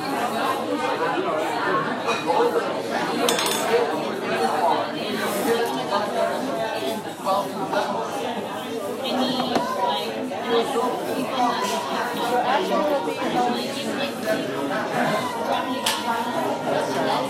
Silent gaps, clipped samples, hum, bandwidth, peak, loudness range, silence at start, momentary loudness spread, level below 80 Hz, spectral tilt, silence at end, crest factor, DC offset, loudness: none; under 0.1%; none; 16 kHz; -2 dBFS; 3 LU; 0 s; 5 LU; -68 dBFS; -3.5 dB/octave; 0 s; 22 dB; under 0.1%; -24 LUFS